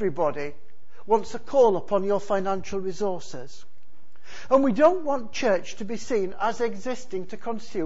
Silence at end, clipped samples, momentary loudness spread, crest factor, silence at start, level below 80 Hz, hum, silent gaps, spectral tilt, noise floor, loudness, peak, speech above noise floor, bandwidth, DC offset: 0 s; under 0.1%; 15 LU; 20 dB; 0 s; -58 dBFS; none; none; -5.5 dB/octave; -62 dBFS; -25 LUFS; -4 dBFS; 37 dB; 8 kHz; 4%